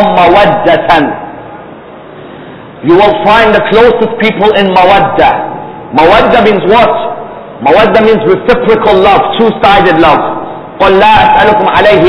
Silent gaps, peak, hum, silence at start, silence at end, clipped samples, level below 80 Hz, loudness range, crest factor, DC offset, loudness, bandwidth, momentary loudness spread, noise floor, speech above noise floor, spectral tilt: none; 0 dBFS; none; 0 s; 0 s; 7%; -32 dBFS; 3 LU; 6 dB; under 0.1%; -6 LUFS; 5.4 kHz; 13 LU; -28 dBFS; 23 dB; -7 dB/octave